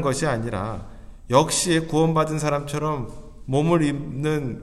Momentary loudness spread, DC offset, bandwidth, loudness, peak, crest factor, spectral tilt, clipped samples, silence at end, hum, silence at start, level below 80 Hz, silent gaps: 11 LU; under 0.1%; 14 kHz; -23 LUFS; -2 dBFS; 20 dB; -5 dB/octave; under 0.1%; 0 s; none; 0 s; -42 dBFS; none